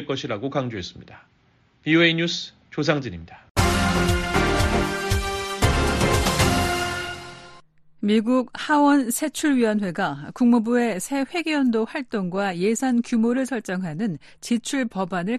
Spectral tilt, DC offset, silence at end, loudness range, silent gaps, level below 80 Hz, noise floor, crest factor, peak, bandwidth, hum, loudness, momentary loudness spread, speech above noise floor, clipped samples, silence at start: -5 dB/octave; under 0.1%; 0 s; 3 LU; 3.50-3.55 s; -36 dBFS; -60 dBFS; 18 dB; -6 dBFS; 13.5 kHz; none; -22 LUFS; 10 LU; 38 dB; under 0.1%; 0 s